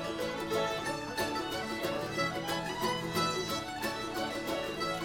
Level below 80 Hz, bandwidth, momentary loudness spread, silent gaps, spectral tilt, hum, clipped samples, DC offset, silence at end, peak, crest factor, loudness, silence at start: -60 dBFS; 18 kHz; 4 LU; none; -3.5 dB/octave; none; under 0.1%; under 0.1%; 0 s; -18 dBFS; 16 dB; -34 LUFS; 0 s